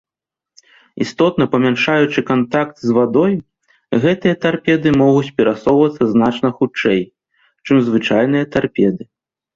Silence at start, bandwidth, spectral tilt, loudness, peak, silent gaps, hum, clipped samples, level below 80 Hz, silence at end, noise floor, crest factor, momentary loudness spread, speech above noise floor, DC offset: 0.95 s; 7.6 kHz; -7 dB/octave; -15 LUFS; -2 dBFS; none; none; under 0.1%; -52 dBFS; 0.5 s; -87 dBFS; 14 dB; 5 LU; 72 dB; under 0.1%